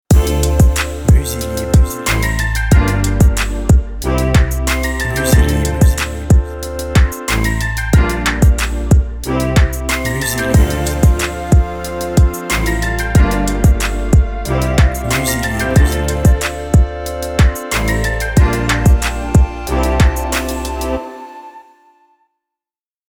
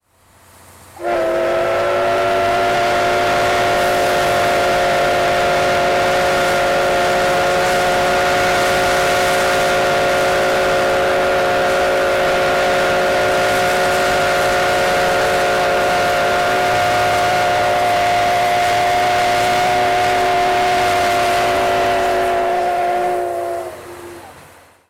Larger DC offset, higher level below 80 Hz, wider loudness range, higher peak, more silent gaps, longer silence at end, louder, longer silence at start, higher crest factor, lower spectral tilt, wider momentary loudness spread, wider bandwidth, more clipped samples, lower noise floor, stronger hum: first, 0.7% vs under 0.1%; first, -16 dBFS vs -40 dBFS; about the same, 1 LU vs 1 LU; first, 0 dBFS vs -10 dBFS; neither; first, 1.5 s vs 0.5 s; about the same, -15 LUFS vs -15 LUFS; second, 0.1 s vs 0.95 s; first, 14 dB vs 4 dB; first, -5.5 dB/octave vs -3.5 dB/octave; first, 6 LU vs 2 LU; first, 19 kHz vs 17 kHz; neither; first, under -90 dBFS vs -50 dBFS; neither